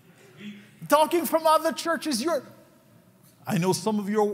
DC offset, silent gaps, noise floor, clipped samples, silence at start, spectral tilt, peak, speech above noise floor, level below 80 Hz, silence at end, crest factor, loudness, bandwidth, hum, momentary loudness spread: under 0.1%; none; -56 dBFS; under 0.1%; 0.4 s; -4.5 dB/octave; -8 dBFS; 33 dB; -78 dBFS; 0 s; 18 dB; -24 LUFS; 16 kHz; none; 22 LU